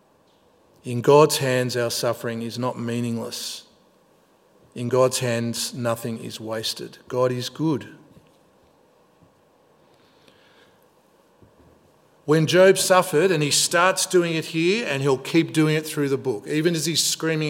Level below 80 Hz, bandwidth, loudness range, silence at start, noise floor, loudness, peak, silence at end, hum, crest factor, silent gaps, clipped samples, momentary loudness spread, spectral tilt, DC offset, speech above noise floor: -70 dBFS; 16.5 kHz; 10 LU; 0.85 s; -59 dBFS; -21 LUFS; -2 dBFS; 0 s; none; 20 dB; none; under 0.1%; 14 LU; -4 dB/octave; under 0.1%; 38 dB